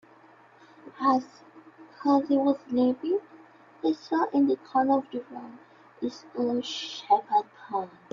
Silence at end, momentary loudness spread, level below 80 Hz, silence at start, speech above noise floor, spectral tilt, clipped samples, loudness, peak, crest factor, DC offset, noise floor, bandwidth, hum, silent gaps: 0.25 s; 12 LU; -76 dBFS; 0.85 s; 29 dB; -5 dB/octave; under 0.1%; -27 LUFS; -10 dBFS; 18 dB; under 0.1%; -55 dBFS; 7.4 kHz; none; none